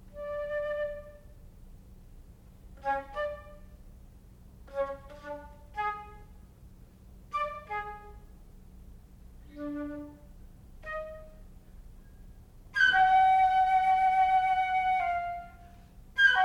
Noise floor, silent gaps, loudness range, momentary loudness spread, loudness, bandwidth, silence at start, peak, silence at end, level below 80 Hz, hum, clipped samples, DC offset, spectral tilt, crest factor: -53 dBFS; none; 18 LU; 22 LU; -28 LUFS; 12 kHz; 0.05 s; -12 dBFS; 0 s; -52 dBFS; none; under 0.1%; under 0.1%; -4 dB/octave; 18 dB